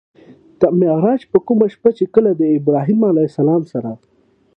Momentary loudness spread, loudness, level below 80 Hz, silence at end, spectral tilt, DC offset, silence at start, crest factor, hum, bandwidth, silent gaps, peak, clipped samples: 7 LU; -15 LUFS; -58 dBFS; 0.6 s; -11 dB/octave; under 0.1%; 0.6 s; 16 dB; none; 5.8 kHz; none; 0 dBFS; under 0.1%